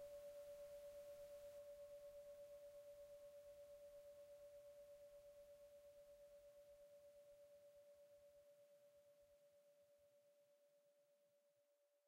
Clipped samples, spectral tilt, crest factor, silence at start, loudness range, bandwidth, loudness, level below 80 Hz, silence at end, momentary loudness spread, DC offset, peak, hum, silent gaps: under 0.1%; -3 dB/octave; 12 dB; 0 s; 8 LU; 16 kHz; -63 LUFS; -86 dBFS; 0 s; 9 LU; under 0.1%; -50 dBFS; none; none